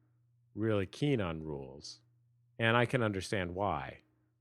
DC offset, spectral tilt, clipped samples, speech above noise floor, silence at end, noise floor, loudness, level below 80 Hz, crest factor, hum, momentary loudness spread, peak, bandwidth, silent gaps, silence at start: under 0.1%; -6 dB/octave; under 0.1%; 37 dB; 0.45 s; -71 dBFS; -34 LUFS; -62 dBFS; 24 dB; none; 19 LU; -12 dBFS; 13 kHz; none; 0.55 s